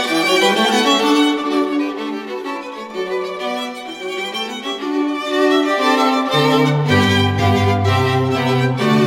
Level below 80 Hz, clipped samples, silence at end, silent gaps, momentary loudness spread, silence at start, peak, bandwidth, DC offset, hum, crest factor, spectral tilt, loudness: -54 dBFS; under 0.1%; 0 s; none; 12 LU; 0 s; -2 dBFS; 16.5 kHz; under 0.1%; none; 14 dB; -5 dB/octave; -16 LUFS